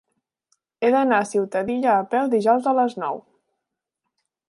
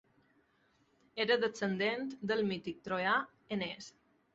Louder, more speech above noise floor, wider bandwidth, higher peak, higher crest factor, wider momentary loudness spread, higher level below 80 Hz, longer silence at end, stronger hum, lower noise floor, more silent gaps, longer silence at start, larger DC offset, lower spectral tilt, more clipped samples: first, -21 LUFS vs -35 LUFS; first, 62 dB vs 38 dB; first, 11.5 kHz vs 8 kHz; first, -6 dBFS vs -18 dBFS; about the same, 16 dB vs 20 dB; second, 7 LU vs 10 LU; about the same, -70 dBFS vs -74 dBFS; first, 1.3 s vs 0.45 s; neither; first, -82 dBFS vs -73 dBFS; neither; second, 0.8 s vs 1.15 s; neither; first, -5.5 dB/octave vs -2.5 dB/octave; neither